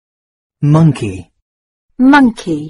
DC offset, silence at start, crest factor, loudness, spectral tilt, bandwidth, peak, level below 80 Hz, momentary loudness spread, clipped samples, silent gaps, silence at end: under 0.1%; 0.6 s; 14 dB; -11 LUFS; -7.5 dB/octave; 11.5 kHz; 0 dBFS; -44 dBFS; 14 LU; under 0.1%; 1.42-1.88 s; 0 s